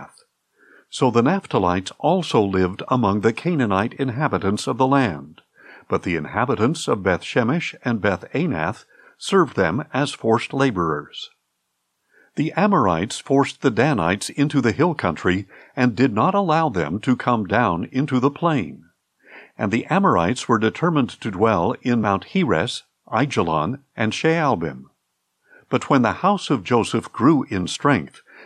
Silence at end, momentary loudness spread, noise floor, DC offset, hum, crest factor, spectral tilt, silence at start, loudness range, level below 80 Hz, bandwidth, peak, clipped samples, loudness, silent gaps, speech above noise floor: 0 s; 7 LU; -74 dBFS; under 0.1%; none; 18 dB; -6 dB/octave; 0 s; 2 LU; -60 dBFS; 12.5 kHz; -4 dBFS; under 0.1%; -20 LUFS; none; 54 dB